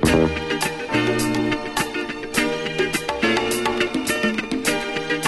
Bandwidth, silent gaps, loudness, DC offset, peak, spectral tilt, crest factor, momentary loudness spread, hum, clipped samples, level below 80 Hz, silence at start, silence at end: 12.5 kHz; none; -22 LUFS; under 0.1%; -6 dBFS; -4 dB/octave; 16 dB; 4 LU; none; under 0.1%; -40 dBFS; 0 s; 0 s